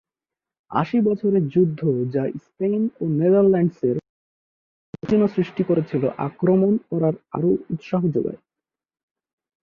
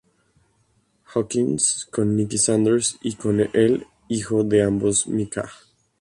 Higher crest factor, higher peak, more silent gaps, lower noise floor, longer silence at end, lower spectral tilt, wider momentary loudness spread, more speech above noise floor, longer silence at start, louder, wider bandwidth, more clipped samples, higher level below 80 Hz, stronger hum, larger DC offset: about the same, 16 dB vs 16 dB; about the same, -6 dBFS vs -6 dBFS; first, 4.09-4.93 s vs none; first, -89 dBFS vs -65 dBFS; first, 1.25 s vs 0.45 s; first, -10.5 dB/octave vs -4.5 dB/octave; about the same, 8 LU vs 9 LU; first, 69 dB vs 44 dB; second, 0.7 s vs 1.1 s; about the same, -21 LUFS vs -21 LUFS; second, 6.4 kHz vs 11.5 kHz; neither; second, -60 dBFS vs -54 dBFS; neither; neither